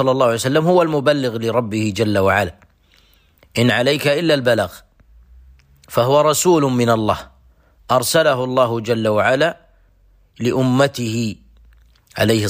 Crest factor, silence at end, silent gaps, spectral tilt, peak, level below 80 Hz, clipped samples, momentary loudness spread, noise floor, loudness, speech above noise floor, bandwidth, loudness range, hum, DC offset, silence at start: 14 dB; 0 s; none; -5 dB/octave; -4 dBFS; -50 dBFS; under 0.1%; 8 LU; -54 dBFS; -17 LUFS; 38 dB; 15.5 kHz; 3 LU; none; under 0.1%; 0 s